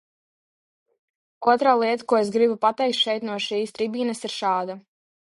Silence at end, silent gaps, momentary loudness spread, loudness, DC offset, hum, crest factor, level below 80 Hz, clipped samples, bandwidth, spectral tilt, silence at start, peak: 0.5 s; none; 8 LU; -22 LUFS; under 0.1%; none; 20 dB; -74 dBFS; under 0.1%; 11.5 kHz; -4 dB/octave; 1.4 s; -4 dBFS